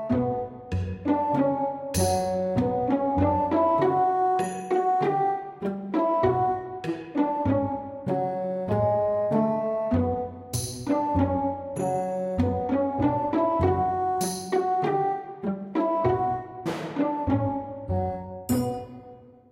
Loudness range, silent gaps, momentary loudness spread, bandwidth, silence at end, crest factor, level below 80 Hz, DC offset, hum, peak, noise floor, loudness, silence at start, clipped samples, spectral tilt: 3 LU; none; 9 LU; 16 kHz; 0.25 s; 14 dB; -48 dBFS; under 0.1%; none; -10 dBFS; -48 dBFS; -26 LUFS; 0 s; under 0.1%; -6.5 dB/octave